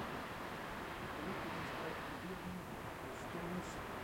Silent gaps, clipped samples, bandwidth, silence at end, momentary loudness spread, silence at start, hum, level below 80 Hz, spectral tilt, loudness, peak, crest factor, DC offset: none; under 0.1%; 16.5 kHz; 0 s; 4 LU; 0 s; none; -62 dBFS; -5 dB/octave; -45 LUFS; -32 dBFS; 14 dB; under 0.1%